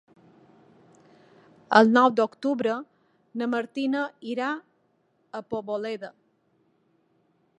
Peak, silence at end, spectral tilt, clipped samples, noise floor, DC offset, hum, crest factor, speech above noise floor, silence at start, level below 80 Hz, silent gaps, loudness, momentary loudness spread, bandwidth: -2 dBFS; 1.5 s; -5.5 dB/octave; under 0.1%; -69 dBFS; under 0.1%; none; 26 dB; 45 dB; 1.7 s; -76 dBFS; none; -25 LUFS; 19 LU; 9 kHz